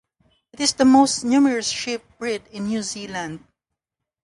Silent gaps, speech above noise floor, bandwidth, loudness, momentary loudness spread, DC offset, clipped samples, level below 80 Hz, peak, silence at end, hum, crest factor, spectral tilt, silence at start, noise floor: none; 64 dB; 11.5 kHz; -20 LUFS; 15 LU; under 0.1%; under 0.1%; -58 dBFS; -4 dBFS; 0.85 s; none; 18 dB; -3 dB/octave; 0.6 s; -84 dBFS